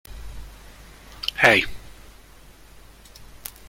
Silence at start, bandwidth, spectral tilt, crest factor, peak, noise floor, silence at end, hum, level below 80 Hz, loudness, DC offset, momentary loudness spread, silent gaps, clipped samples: 0.05 s; 16.5 kHz; -3 dB/octave; 26 dB; -2 dBFS; -48 dBFS; 0.2 s; none; -44 dBFS; -19 LUFS; under 0.1%; 28 LU; none; under 0.1%